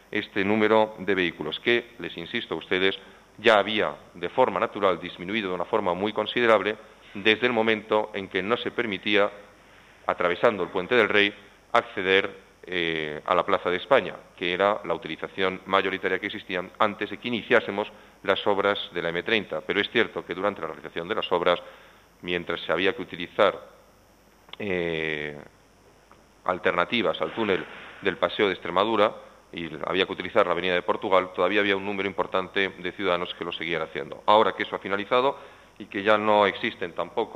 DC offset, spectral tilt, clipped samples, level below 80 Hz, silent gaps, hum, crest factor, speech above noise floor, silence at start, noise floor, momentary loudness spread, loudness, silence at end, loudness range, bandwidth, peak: under 0.1%; -5.5 dB/octave; under 0.1%; -64 dBFS; none; none; 24 dB; 32 dB; 0.1 s; -57 dBFS; 11 LU; -25 LUFS; 0 s; 4 LU; 12.5 kHz; -2 dBFS